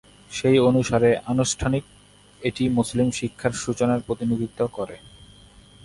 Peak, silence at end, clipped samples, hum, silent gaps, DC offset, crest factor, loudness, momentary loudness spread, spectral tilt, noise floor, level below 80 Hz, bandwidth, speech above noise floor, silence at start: -6 dBFS; 0.85 s; under 0.1%; 50 Hz at -55 dBFS; none; under 0.1%; 18 dB; -23 LUFS; 11 LU; -5.5 dB/octave; -50 dBFS; -46 dBFS; 11.5 kHz; 28 dB; 0.3 s